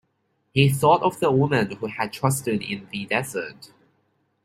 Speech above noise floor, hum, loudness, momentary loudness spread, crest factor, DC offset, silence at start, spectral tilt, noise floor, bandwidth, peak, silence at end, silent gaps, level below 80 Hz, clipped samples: 49 dB; none; -23 LUFS; 12 LU; 20 dB; under 0.1%; 0.55 s; -5.5 dB/octave; -71 dBFS; 16 kHz; -2 dBFS; 0.8 s; none; -58 dBFS; under 0.1%